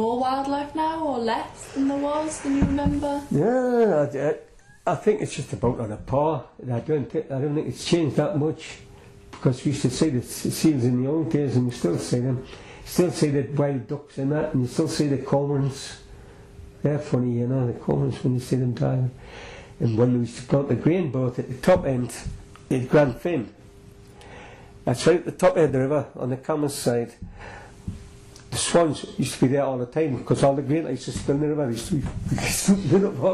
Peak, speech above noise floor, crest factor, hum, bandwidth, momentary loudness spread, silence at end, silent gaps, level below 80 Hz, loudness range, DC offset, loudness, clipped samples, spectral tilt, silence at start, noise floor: -10 dBFS; 24 dB; 14 dB; none; 13 kHz; 13 LU; 0 s; none; -46 dBFS; 3 LU; under 0.1%; -24 LUFS; under 0.1%; -6 dB/octave; 0 s; -47 dBFS